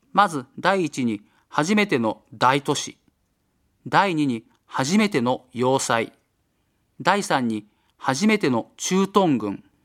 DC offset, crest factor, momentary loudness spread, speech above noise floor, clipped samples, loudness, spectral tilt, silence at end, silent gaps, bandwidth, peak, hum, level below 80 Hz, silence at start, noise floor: under 0.1%; 22 dB; 9 LU; 48 dB; under 0.1%; -22 LUFS; -4.5 dB/octave; 0.25 s; none; 15 kHz; 0 dBFS; none; -68 dBFS; 0.15 s; -69 dBFS